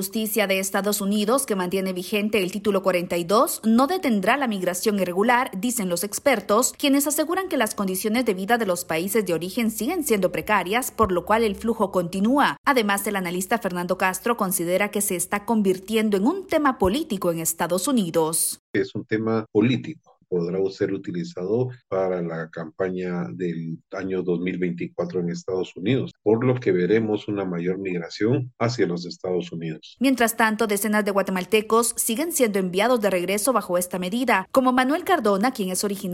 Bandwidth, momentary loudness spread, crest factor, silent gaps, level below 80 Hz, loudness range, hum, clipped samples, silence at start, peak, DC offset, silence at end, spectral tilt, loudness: 16.5 kHz; 8 LU; 16 dB; 12.58-12.64 s, 18.59-18.74 s; -54 dBFS; 5 LU; none; under 0.1%; 0 s; -6 dBFS; under 0.1%; 0 s; -4.5 dB/octave; -23 LUFS